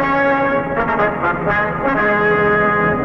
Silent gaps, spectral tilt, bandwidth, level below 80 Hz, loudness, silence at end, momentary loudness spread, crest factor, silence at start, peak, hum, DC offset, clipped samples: none; -8 dB/octave; 6.4 kHz; -38 dBFS; -16 LUFS; 0 s; 4 LU; 12 dB; 0 s; -4 dBFS; none; under 0.1%; under 0.1%